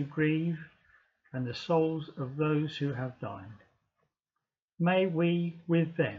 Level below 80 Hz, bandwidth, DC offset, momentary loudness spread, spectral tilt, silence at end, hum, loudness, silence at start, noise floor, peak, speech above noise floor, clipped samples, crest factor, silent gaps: -72 dBFS; 7 kHz; under 0.1%; 14 LU; -8.5 dB/octave; 0 s; none; -31 LUFS; 0 s; -89 dBFS; -16 dBFS; 58 dB; under 0.1%; 16 dB; 4.62-4.68 s